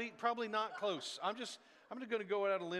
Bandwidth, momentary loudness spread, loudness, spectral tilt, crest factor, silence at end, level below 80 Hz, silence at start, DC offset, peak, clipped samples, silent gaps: 13 kHz; 12 LU; -40 LUFS; -3.5 dB/octave; 18 dB; 0 s; under -90 dBFS; 0 s; under 0.1%; -22 dBFS; under 0.1%; none